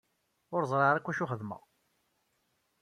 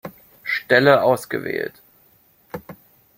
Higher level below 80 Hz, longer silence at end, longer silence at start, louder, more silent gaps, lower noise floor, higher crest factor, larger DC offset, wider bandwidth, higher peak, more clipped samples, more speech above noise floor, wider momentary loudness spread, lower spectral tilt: second, -76 dBFS vs -62 dBFS; first, 1.25 s vs 0.45 s; first, 0.5 s vs 0.05 s; second, -31 LUFS vs -18 LUFS; neither; first, -77 dBFS vs -57 dBFS; about the same, 22 dB vs 22 dB; neither; second, 13.5 kHz vs 16.5 kHz; second, -14 dBFS vs 0 dBFS; neither; first, 46 dB vs 39 dB; second, 15 LU vs 23 LU; first, -7 dB/octave vs -5.5 dB/octave